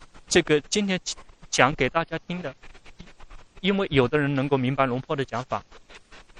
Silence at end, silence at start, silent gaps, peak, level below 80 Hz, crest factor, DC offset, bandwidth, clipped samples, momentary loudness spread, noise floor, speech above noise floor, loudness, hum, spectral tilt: 0 s; 0 s; none; 0 dBFS; -48 dBFS; 26 dB; under 0.1%; 11.5 kHz; under 0.1%; 12 LU; -48 dBFS; 24 dB; -25 LUFS; none; -4.5 dB/octave